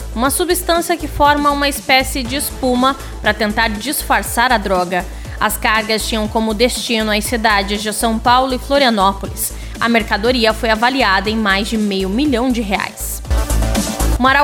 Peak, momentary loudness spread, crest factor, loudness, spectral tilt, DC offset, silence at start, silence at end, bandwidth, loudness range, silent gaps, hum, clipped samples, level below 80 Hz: 0 dBFS; 7 LU; 16 dB; -15 LUFS; -3.5 dB/octave; under 0.1%; 0 s; 0 s; 19 kHz; 1 LU; none; none; under 0.1%; -26 dBFS